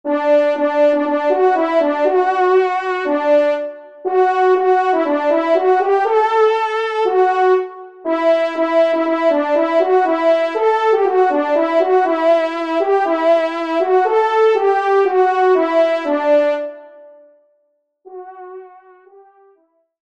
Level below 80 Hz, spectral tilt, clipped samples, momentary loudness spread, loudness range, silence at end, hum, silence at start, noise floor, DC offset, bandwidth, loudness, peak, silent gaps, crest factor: -70 dBFS; -3.5 dB/octave; under 0.1%; 5 LU; 2 LU; 1.4 s; none; 0.05 s; -65 dBFS; 0.2%; 8 kHz; -15 LUFS; -4 dBFS; none; 12 dB